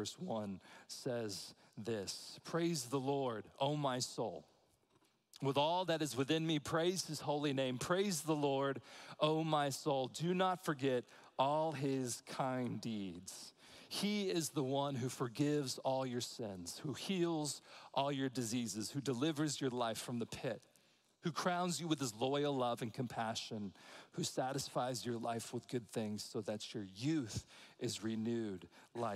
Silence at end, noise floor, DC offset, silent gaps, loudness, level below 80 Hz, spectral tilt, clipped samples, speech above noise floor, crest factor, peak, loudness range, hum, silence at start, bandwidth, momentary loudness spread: 0 s; -75 dBFS; under 0.1%; none; -40 LUFS; -76 dBFS; -4.5 dB/octave; under 0.1%; 36 dB; 20 dB; -20 dBFS; 5 LU; none; 0 s; 16 kHz; 10 LU